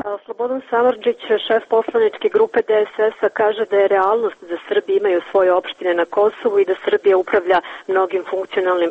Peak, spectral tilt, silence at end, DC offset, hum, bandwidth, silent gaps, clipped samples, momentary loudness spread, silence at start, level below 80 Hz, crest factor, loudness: -4 dBFS; -5.5 dB/octave; 0 s; under 0.1%; none; 4.8 kHz; none; under 0.1%; 6 LU; 0.05 s; -64 dBFS; 14 dB; -18 LUFS